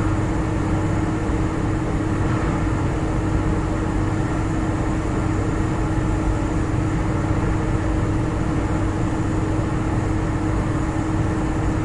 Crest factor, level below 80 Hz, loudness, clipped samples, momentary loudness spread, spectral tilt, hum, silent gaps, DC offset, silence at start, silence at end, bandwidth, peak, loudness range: 12 dB; -28 dBFS; -22 LUFS; under 0.1%; 1 LU; -7.5 dB/octave; none; none; under 0.1%; 0 s; 0 s; 11.5 kHz; -8 dBFS; 0 LU